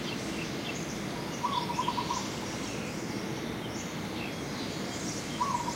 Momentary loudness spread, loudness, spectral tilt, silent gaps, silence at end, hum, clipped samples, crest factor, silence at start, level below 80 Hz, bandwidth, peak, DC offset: 5 LU; -34 LUFS; -4 dB/octave; none; 0 s; none; under 0.1%; 16 dB; 0 s; -56 dBFS; 16 kHz; -18 dBFS; under 0.1%